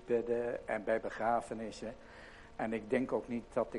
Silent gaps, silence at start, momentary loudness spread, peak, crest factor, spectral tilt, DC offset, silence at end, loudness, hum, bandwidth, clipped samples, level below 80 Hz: none; 0 s; 15 LU; -18 dBFS; 18 dB; -6 dB/octave; under 0.1%; 0 s; -37 LUFS; none; 11 kHz; under 0.1%; -60 dBFS